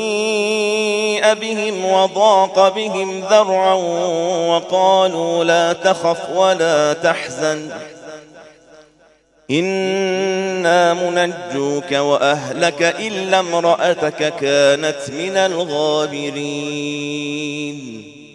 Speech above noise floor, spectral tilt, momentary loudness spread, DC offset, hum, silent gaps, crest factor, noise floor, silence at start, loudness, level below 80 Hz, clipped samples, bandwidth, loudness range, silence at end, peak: 36 dB; -3.5 dB/octave; 9 LU; under 0.1%; none; none; 16 dB; -53 dBFS; 0 s; -16 LUFS; -66 dBFS; under 0.1%; 11.5 kHz; 6 LU; 0.05 s; 0 dBFS